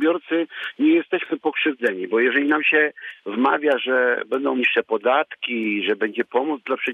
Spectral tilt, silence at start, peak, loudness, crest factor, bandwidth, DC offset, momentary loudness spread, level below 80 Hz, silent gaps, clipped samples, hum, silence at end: -5.5 dB/octave; 0 s; -6 dBFS; -21 LUFS; 16 dB; 4.1 kHz; under 0.1%; 7 LU; -76 dBFS; none; under 0.1%; none; 0 s